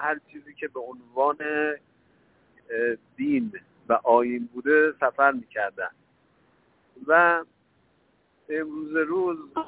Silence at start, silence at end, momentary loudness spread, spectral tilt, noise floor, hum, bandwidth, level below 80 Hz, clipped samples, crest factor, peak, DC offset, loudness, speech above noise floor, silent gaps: 0 s; 0 s; 15 LU; -8.5 dB/octave; -66 dBFS; none; 4 kHz; -70 dBFS; under 0.1%; 20 dB; -6 dBFS; under 0.1%; -25 LUFS; 41 dB; none